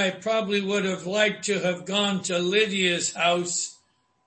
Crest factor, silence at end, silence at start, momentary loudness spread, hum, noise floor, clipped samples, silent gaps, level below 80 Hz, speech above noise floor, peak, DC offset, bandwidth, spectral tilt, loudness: 18 dB; 0.55 s; 0 s; 5 LU; none; -66 dBFS; under 0.1%; none; -70 dBFS; 41 dB; -8 dBFS; under 0.1%; 8.8 kHz; -3 dB/octave; -24 LUFS